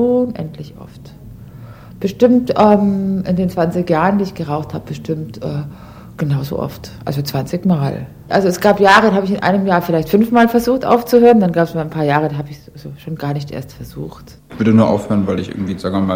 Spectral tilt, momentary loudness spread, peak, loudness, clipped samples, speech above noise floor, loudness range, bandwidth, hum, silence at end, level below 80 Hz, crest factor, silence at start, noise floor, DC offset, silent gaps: -7 dB/octave; 18 LU; 0 dBFS; -15 LUFS; under 0.1%; 20 dB; 8 LU; 16.5 kHz; none; 0 s; -44 dBFS; 16 dB; 0 s; -35 dBFS; under 0.1%; none